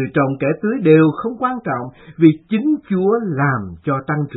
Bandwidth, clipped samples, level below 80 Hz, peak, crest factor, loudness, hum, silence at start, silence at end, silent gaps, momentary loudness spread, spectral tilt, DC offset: 4.1 kHz; under 0.1%; -54 dBFS; 0 dBFS; 16 dB; -17 LUFS; none; 0 s; 0 s; none; 10 LU; -12 dB/octave; under 0.1%